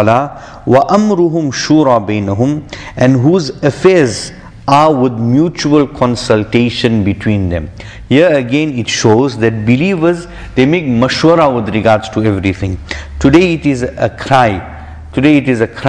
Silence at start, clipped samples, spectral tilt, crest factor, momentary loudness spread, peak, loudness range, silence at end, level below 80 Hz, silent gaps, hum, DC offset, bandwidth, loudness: 0 s; 0.3%; -6 dB/octave; 12 dB; 12 LU; 0 dBFS; 1 LU; 0 s; -34 dBFS; none; none; under 0.1%; 10.5 kHz; -11 LUFS